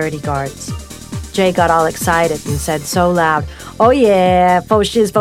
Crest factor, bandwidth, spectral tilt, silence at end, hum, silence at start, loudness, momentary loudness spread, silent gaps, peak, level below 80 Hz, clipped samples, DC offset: 14 dB; 16.5 kHz; -5 dB/octave; 0 s; none; 0 s; -14 LUFS; 16 LU; none; 0 dBFS; -36 dBFS; under 0.1%; under 0.1%